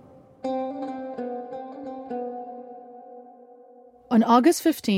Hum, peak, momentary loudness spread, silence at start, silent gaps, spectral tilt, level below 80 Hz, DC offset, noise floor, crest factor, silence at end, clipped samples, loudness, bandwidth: none; -6 dBFS; 26 LU; 0.45 s; none; -5 dB/octave; -70 dBFS; under 0.1%; -51 dBFS; 20 dB; 0 s; under 0.1%; -25 LUFS; 16.5 kHz